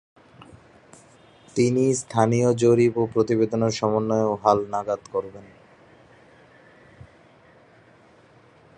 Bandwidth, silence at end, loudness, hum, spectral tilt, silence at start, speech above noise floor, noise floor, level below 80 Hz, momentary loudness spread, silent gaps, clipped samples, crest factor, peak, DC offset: 10.5 kHz; 3.35 s; -22 LUFS; none; -6.5 dB/octave; 1.55 s; 32 dB; -54 dBFS; -60 dBFS; 9 LU; none; under 0.1%; 22 dB; -4 dBFS; under 0.1%